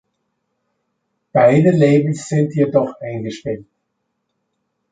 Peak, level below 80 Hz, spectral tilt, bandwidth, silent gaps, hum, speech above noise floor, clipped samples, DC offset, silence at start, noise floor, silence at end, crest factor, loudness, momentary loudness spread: -2 dBFS; -58 dBFS; -7.5 dB/octave; 9.2 kHz; none; none; 58 dB; under 0.1%; under 0.1%; 1.35 s; -73 dBFS; 1.3 s; 16 dB; -16 LUFS; 15 LU